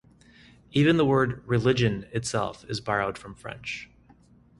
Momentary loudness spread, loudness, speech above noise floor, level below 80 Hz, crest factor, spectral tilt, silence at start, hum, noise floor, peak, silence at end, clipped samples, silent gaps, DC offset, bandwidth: 15 LU; -26 LUFS; 31 dB; -52 dBFS; 18 dB; -6 dB/octave; 0.75 s; none; -57 dBFS; -8 dBFS; 0.75 s; under 0.1%; none; under 0.1%; 11.5 kHz